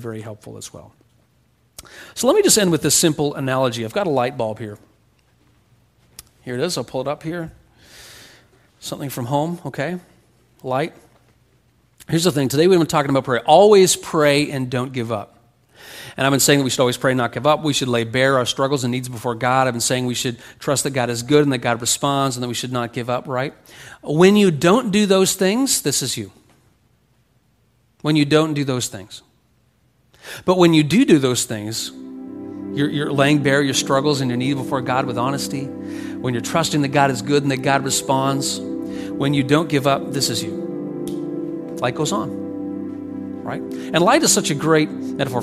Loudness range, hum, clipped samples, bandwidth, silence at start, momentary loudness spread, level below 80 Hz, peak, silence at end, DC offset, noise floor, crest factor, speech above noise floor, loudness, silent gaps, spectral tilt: 10 LU; none; under 0.1%; 15.5 kHz; 0 s; 15 LU; -56 dBFS; 0 dBFS; 0 s; under 0.1%; -60 dBFS; 20 dB; 42 dB; -19 LUFS; none; -4 dB/octave